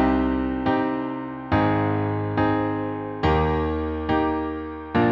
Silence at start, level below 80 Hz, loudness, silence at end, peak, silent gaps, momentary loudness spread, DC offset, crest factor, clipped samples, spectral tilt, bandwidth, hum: 0 s; -36 dBFS; -24 LUFS; 0 s; -8 dBFS; none; 7 LU; under 0.1%; 14 dB; under 0.1%; -9 dB/octave; 5.8 kHz; none